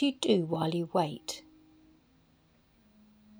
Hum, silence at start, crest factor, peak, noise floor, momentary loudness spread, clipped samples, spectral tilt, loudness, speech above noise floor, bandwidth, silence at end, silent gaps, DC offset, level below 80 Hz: none; 0 s; 20 dB; -14 dBFS; -66 dBFS; 13 LU; under 0.1%; -5.5 dB/octave; -31 LUFS; 36 dB; over 20 kHz; 2 s; none; under 0.1%; -72 dBFS